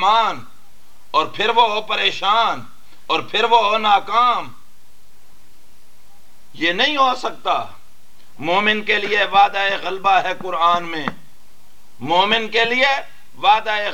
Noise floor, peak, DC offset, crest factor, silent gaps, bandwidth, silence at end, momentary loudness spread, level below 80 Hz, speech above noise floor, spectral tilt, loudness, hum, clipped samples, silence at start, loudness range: -55 dBFS; -2 dBFS; 3%; 18 dB; none; 17 kHz; 0 s; 9 LU; -62 dBFS; 37 dB; -3 dB/octave; -17 LUFS; none; under 0.1%; 0 s; 5 LU